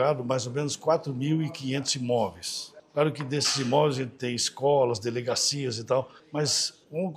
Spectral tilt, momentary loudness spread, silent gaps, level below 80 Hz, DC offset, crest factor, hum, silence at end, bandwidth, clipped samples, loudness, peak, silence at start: -4 dB/octave; 7 LU; none; -70 dBFS; under 0.1%; 18 dB; none; 0 s; 15 kHz; under 0.1%; -27 LUFS; -10 dBFS; 0 s